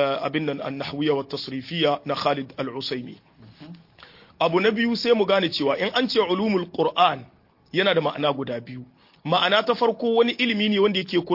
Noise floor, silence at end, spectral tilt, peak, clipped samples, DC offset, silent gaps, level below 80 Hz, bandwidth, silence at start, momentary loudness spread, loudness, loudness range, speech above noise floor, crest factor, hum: -50 dBFS; 0 s; -6 dB/octave; -4 dBFS; under 0.1%; under 0.1%; none; -66 dBFS; 5.8 kHz; 0 s; 11 LU; -23 LUFS; 5 LU; 27 dB; 18 dB; none